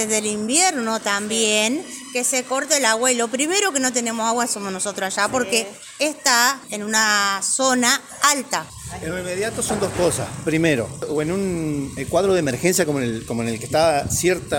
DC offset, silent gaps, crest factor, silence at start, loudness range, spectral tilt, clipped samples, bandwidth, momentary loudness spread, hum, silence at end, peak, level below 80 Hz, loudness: under 0.1%; none; 18 dB; 0 s; 3 LU; -2.5 dB/octave; under 0.1%; 17 kHz; 9 LU; none; 0 s; -2 dBFS; -48 dBFS; -20 LUFS